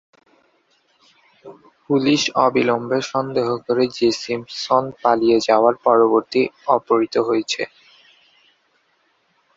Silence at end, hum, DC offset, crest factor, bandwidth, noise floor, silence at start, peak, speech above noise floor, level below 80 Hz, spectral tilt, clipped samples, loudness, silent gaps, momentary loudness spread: 1.9 s; none; under 0.1%; 20 dB; 7.8 kHz; -64 dBFS; 1.45 s; 0 dBFS; 45 dB; -64 dBFS; -4.5 dB/octave; under 0.1%; -18 LUFS; none; 7 LU